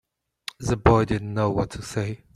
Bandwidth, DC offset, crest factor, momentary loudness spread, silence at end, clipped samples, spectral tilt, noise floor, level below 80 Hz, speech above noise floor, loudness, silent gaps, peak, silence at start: 13.5 kHz; under 0.1%; 22 dB; 14 LU; 0.2 s; under 0.1%; -6.5 dB/octave; -43 dBFS; -40 dBFS; 20 dB; -24 LUFS; none; -2 dBFS; 0.6 s